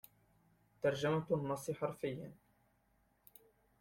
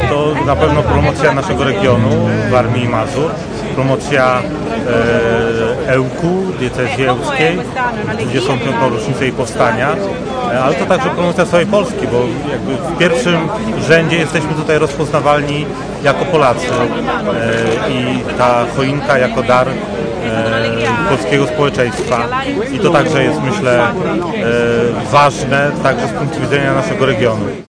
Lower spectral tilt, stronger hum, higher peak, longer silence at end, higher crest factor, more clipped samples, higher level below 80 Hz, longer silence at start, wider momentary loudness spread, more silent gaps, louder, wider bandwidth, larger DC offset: about the same, -6 dB/octave vs -6 dB/octave; neither; second, -22 dBFS vs 0 dBFS; first, 1.5 s vs 0.05 s; first, 20 dB vs 12 dB; neither; second, -74 dBFS vs -34 dBFS; first, 0.85 s vs 0 s; first, 10 LU vs 6 LU; neither; second, -39 LUFS vs -14 LUFS; first, 16.5 kHz vs 10.5 kHz; neither